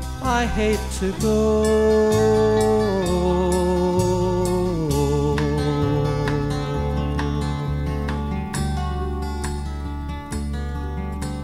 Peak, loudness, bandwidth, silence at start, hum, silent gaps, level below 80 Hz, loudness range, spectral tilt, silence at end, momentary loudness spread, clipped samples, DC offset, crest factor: -6 dBFS; -22 LUFS; 15.5 kHz; 0 s; none; none; -30 dBFS; 8 LU; -6.5 dB/octave; 0 s; 11 LU; under 0.1%; under 0.1%; 14 dB